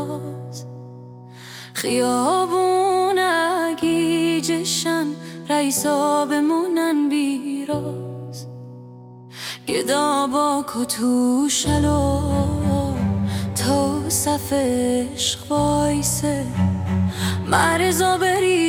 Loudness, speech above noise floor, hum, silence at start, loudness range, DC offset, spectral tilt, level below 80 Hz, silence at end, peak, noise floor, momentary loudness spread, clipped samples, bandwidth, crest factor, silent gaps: -20 LUFS; 21 dB; none; 0 s; 4 LU; under 0.1%; -4.5 dB/octave; -44 dBFS; 0 s; -2 dBFS; -40 dBFS; 15 LU; under 0.1%; 17.5 kHz; 18 dB; none